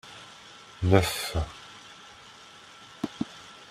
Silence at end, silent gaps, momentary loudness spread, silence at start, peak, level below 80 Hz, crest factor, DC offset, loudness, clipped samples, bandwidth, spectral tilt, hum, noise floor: 0.05 s; none; 24 LU; 0.05 s; -6 dBFS; -48 dBFS; 26 dB; under 0.1%; -28 LUFS; under 0.1%; 16 kHz; -5.5 dB/octave; none; -50 dBFS